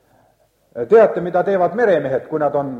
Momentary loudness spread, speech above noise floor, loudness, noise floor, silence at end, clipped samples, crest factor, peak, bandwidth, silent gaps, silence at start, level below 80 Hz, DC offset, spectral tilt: 10 LU; 43 dB; -16 LUFS; -58 dBFS; 0 s; under 0.1%; 16 dB; -2 dBFS; 6.8 kHz; none; 0.75 s; -60 dBFS; under 0.1%; -8 dB/octave